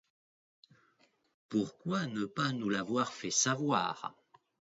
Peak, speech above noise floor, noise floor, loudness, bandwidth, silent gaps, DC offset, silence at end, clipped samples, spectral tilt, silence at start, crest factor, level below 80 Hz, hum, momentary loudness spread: -16 dBFS; 38 dB; -72 dBFS; -33 LUFS; 7.6 kHz; none; under 0.1%; 0.6 s; under 0.1%; -4 dB/octave; 1.5 s; 20 dB; -76 dBFS; none; 7 LU